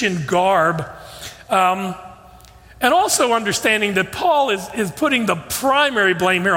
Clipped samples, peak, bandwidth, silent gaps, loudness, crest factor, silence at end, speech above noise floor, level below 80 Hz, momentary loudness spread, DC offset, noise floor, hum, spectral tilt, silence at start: under 0.1%; -2 dBFS; 16.5 kHz; none; -17 LUFS; 16 dB; 0 s; 26 dB; -52 dBFS; 12 LU; under 0.1%; -44 dBFS; none; -3.5 dB/octave; 0 s